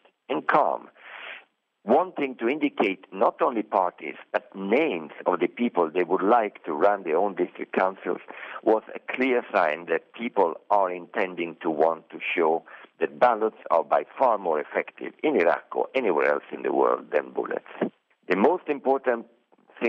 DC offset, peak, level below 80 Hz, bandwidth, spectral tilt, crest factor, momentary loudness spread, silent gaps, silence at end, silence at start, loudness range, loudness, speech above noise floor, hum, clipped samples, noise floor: under 0.1%; -6 dBFS; -78 dBFS; 6.4 kHz; -7.5 dB/octave; 20 dB; 10 LU; none; 0 s; 0.3 s; 2 LU; -25 LUFS; 28 dB; none; under 0.1%; -53 dBFS